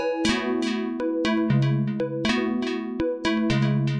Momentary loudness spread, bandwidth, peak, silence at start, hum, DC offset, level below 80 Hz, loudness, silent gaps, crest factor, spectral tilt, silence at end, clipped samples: 5 LU; 11 kHz; -10 dBFS; 0 s; none; under 0.1%; -50 dBFS; -24 LUFS; none; 14 dB; -6.5 dB/octave; 0 s; under 0.1%